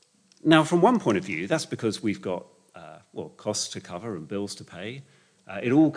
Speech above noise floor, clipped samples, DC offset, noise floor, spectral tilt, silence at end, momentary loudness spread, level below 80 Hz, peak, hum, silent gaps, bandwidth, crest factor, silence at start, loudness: 22 dB; under 0.1%; under 0.1%; -47 dBFS; -5 dB/octave; 0 s; 19 LU; -72 dBFS; -4 dBFS; none; none; 10.5 kHz; 22 dB; 0.45 s; -26 LUFS